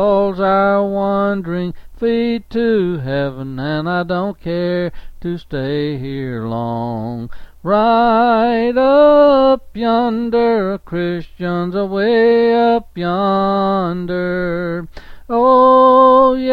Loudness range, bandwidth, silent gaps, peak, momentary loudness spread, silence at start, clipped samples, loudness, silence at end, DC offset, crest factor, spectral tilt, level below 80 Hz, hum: 8 LU; 5.4 kHz; none; 0 dBFS; 14 LU; 0 s; under 0.1%; -15 LUFS; 0 s; under 0.1%; 14 dB; -9 dB/octave; -40 dBFS; none